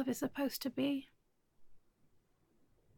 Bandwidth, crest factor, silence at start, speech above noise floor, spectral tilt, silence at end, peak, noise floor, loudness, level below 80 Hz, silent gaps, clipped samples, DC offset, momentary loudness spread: 17.5 kHz; 16 dB; 0 s; 35 dB; -4 dB/octave; 1.2 s; -26 dBFS; -73 dBFS; -38 LUFS; -74 dBFS; none; under 0.1%; under 0.1%; 2 LU